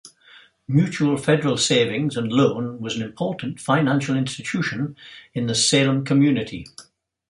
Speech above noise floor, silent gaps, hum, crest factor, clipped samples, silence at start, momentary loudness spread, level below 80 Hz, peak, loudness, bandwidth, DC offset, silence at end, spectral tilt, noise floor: 30 dB; none; none; 18 dB; under 0.1%; 0.05 s; 11 LU; -58 dBFS; -4 dBFS; -21 LUFS; 11.5 kHz; under 0.1%; 0.45 s; -4.5 dB/octave; -51 dBFS